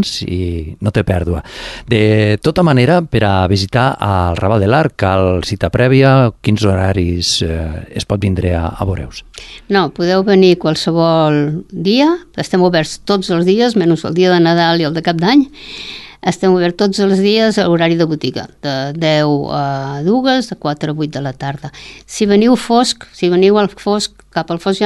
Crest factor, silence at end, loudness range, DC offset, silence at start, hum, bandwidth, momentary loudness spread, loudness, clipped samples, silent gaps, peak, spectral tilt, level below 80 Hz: 12 dB; 0 s; 4 LU; under 0.1%; 0 s; none; 12.5 kHz; 11 LU; -14 LUFS; under 0.1%; none; 0 dBFS; -6 dB/octave; -32 dBFS